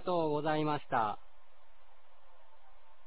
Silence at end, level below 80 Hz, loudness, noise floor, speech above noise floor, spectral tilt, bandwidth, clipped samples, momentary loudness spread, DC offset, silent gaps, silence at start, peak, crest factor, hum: 1.9 s; -72 dBFS; -34 LUFS; -64 dBFS; 32 dB; -5 dB/octave; 4 kHz; under 0.1%; 5 LU; 0.8%; none; 0 s; -18 dBFS; 20 dB; none